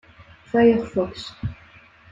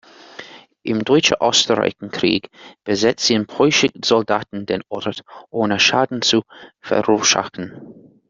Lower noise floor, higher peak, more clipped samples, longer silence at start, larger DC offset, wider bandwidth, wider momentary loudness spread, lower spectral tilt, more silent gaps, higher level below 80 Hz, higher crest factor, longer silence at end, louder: first, -50 dBFS vs -40 dBFS; second, -4 dBFS vs 0 dBFS; neither; first, 0.55 s vs 0.4 s; neither; about the same, 7.8 kHz vs 7.8 kHz; about the same, 16 LU vs 17 LU; first, -7 dB/octave vs -3 dB/octave; neither; first, -48 dBFS vs -58 dBFS; about the same, 18 dB vs 20 dB; first, 0.6 s vs 0.35 s; second, -21 LUFS vs -17 LUFS